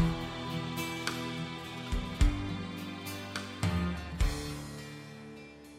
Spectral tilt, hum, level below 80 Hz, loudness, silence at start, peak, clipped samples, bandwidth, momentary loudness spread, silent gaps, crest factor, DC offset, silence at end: -5 dB/octave; none; -38 dBFS; -36 LUFS; 0 s; -16 dBFS; under 0.1%; 16 kHz; 14 LU; none; 20 dB; under 0.1%; 0 s